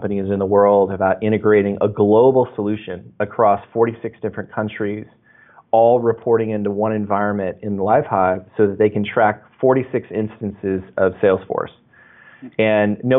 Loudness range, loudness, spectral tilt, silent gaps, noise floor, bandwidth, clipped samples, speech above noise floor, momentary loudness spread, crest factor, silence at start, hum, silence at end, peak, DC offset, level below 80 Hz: 5 LU; -18 LUFS; -6.5 dB/octave; none; -49 dBFS; 3.9 kHz; under 0.1%; 32 dB; 12 LU; 14 dB; 0 s; none; 0 s; -4 dBFS; under 0.1%; -58 dBFS